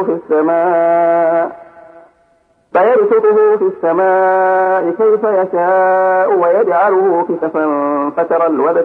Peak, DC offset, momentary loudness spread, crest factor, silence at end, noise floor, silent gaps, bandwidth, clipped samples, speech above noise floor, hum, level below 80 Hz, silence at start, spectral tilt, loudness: -2 dBFS; under 0.1%; 5 LU; 10 dB; 0 s; -55 dBFS; none; 3.9 kHz; under 0.1%; 43 dB; none; -66 dBFS; 0 s; -9 dB/octave; -12 LUFS